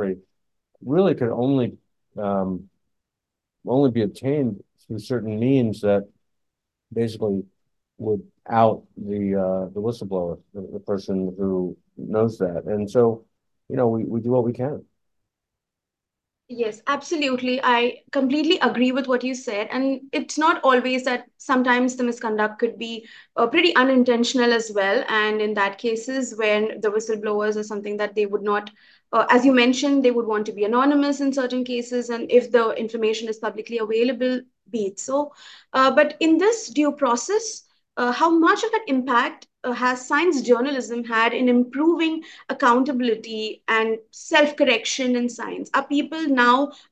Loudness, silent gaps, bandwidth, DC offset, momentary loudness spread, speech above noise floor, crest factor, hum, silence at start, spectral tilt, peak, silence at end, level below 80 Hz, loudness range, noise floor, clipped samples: -22 LUFS; none; 9.2 kHz; under 0.1%; 12 LU; 64 dB; 20 dB; none; 0 s; -5 dB/octave; -2 dBFS; 0.15 s; -60 dBFS; 6 LU; -85 dBFS; under 0.1%